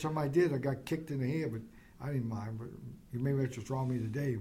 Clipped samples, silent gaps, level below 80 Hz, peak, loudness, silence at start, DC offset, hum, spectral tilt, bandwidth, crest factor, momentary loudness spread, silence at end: under 0.1%; none; -62 dBFS; -18 dBFS; -35 LUFS; 0 s; under 0.1%; none; -8 dB/octave; 16 kHz; 16 dB; 15 LU; 0 s